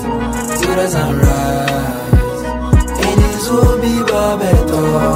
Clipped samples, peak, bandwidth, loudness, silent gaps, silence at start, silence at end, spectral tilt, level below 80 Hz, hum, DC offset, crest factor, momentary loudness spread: under 0.1%; 0 dBFS; 16.5 kHz; -14 LUFS; none; 0 s; 0 s; -6 dB/octave; -20 dBFS; none; under 0.1%; 12 dB; 6 LU